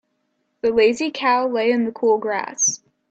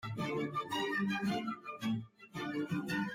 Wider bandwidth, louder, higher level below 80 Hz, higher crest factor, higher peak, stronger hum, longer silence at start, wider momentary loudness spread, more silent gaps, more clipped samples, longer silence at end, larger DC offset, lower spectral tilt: second, 8.6 kHz vs 16 kHz; first, -19 LUFS vs -37 LUFS; first, -62 dBFS vs -70 dBFS; about the same, 16 dB vs 14 dB; first, -6 dBFS vs -24 dBFS; neither; first, 0.65 s vs 0 s; about the same, 6 LU vs 7 LU; neither; neither; first, 0.35 s vs 0 s; neither; second, -2 dB/octave vs -5.5 dB/octave